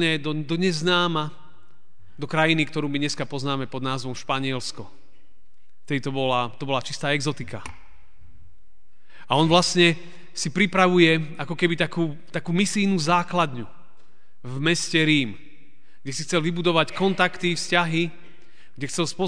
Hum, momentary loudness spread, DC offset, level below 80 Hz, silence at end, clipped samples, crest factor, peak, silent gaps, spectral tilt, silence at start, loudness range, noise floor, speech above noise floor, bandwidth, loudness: none; 15 LU; 2%; -60 dBFS; 0 s; under 0.1%; 22 dB; -2 dBFS; none; -4.5 dB/octave; 0 s; 7 LU; -66 dBFS; 42 dB; 10 kHz; -23 LUFS